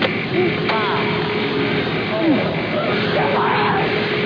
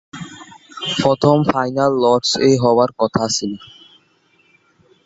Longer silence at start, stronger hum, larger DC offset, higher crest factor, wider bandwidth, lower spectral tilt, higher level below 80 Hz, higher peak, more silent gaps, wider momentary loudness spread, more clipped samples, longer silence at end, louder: second, 0 s vs 0.15 s; neither; neither; about the same, 14 dB vs 18 dB; second, 5.4 kHz vs 8 kHz; first, -7.5 dB/octave vs -5 dB/octave; about the same, -50 dBFS vs -52 dBFS; second, -4 dBFS vs 0 dBFS; neither; second, 3 LU vs 19 LU; neither; second, 0 s vs 1.4 s; about the same, -18 LUFS vs -16 LUFS